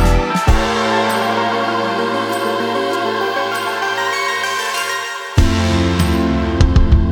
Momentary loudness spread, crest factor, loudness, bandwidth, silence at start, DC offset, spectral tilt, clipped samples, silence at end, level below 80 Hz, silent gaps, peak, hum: 4 LU; 14 dB; -16 LUFS; 19.5 kHz; 0 s; under 0.1%; -5 dB/octave; under 0.1%; 0 s; -20 dBFS; none; 0 dBFS; none